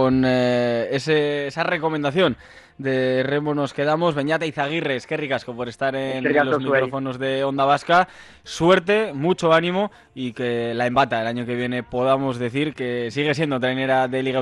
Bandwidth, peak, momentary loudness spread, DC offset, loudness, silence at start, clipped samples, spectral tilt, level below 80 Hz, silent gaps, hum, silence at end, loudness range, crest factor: 11.5 kHz; -6 dBFS; 8 LU; under 0.1%; -21 LUFS; 0 s; under 0.1%; -6 dB/octave; -56 dBFS; none; none; 0 s; 3 LU; 16 dB